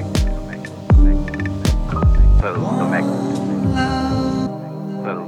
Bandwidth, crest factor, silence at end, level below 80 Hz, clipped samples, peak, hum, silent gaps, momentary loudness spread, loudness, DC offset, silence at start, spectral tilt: 11.5 kHz; 12 dB; 0 s; -18 dBFS; under 0.1%; -4 dBFS; none; none; 11 LU; -19 LUFS; under 0.1%; 0 s; -7 dB/octave